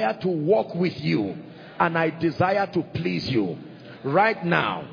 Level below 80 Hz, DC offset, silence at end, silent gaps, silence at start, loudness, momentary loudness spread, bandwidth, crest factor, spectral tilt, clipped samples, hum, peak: -60 dBFS; under 0.1%; 0 s; none; 0 s; -24 LUFS; 12 LU; 5.2 kHz; 20 dB; -8 dB/octave; under 0.1%; none; -4 dBFS